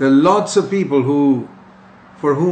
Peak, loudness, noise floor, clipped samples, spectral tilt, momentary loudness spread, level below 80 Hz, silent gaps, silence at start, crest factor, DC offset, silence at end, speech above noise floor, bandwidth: -2 dBFS; -16 LUFS; -43 dBFS; under 0.1%; -6.5 dB/octave; 9 LU; -62 dBFS; none; 0 s; 14 dB; under 0.1%; 0 s; 29 dB; 9.2 kHz